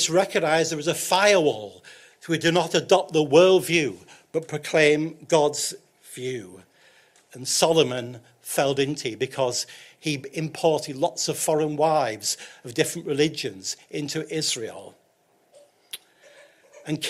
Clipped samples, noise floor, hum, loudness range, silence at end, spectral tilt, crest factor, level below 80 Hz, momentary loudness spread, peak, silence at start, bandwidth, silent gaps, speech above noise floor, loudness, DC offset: under 0.1%; -64 dBFS; none; 7 LU; 0 s; -3.5 dB/octave; 20 dB; -68 dBFS; 17 LU; -4 dBFS; 0 s; 16 kHz; none; 41 dB; -23 LUFS; under 0.1%